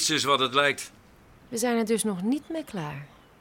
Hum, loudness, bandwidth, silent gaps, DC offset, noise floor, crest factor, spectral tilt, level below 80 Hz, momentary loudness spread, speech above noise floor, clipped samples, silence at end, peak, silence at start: none; -26 LUFS; 18 kHz; none; under 0.1%; -54 dBFS; 20 dB; -3 dB/octave; -64 dBFS; 14 LU; 27 dB; under 0.1%; 0.35 s; -8 dBFS; 0 s